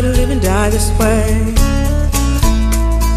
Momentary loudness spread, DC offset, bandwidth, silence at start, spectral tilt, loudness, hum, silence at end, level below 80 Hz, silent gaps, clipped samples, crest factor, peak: 2 LU; under 0.1%; 15 kHz; 0 s; -5.5 dB/octave; -14 LUFS; none; 0 s; -14 dBFS; none; under 0.1%; 10 dB; -2 dBFS